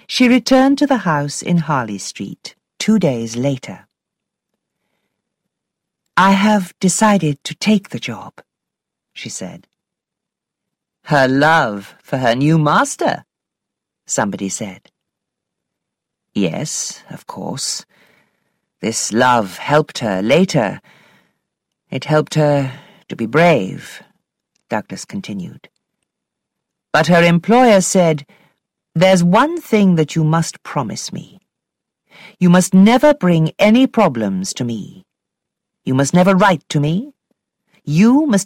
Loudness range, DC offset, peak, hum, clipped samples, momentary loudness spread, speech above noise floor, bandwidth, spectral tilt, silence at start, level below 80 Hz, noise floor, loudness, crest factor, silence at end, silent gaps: 11 LU; under 0.1%; -2 dBFS; none; under 0.1%; 17 LU; 67 dB; 16 kHz; -5.5 dB/octave; 0.1 s; -54 dBFS; -82 dBFS; -15 LUFS; 14 dB; 0 s; none